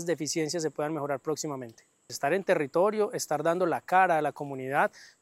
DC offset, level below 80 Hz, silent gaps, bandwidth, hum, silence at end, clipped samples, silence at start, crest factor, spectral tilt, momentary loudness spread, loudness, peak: under 0.1%; -82 dBFS; none; 16 kHz; none; 0.15 s; under 0.1%; 0 s; 18 dB; -4 dB/octave; 10 LU; -28 LUFS; -10 dBFS